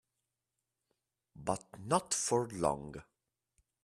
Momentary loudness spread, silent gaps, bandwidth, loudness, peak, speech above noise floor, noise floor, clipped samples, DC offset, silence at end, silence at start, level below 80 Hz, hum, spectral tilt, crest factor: 13 LU; none; 13.5 kHz; -35 LUFS; -16 dBFS; 54 dB; -89 dBFS; under 0.1%; under 0.1%; 0.8 s; 1.35 s; -66 dBFS; none; -4 dB/octave; 24 dB